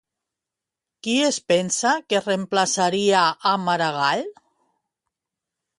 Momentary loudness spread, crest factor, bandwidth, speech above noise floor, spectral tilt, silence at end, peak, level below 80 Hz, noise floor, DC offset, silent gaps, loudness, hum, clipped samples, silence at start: 5 LU; 18 dB; 11.5 kHz; 66 dB; -3 dB/octave; 1.45 s; -4 dBFS; -72 dBFS; -87 dBFS; under 0.1%; none; -21 LUFS; none; under 0.1%; 1.05 s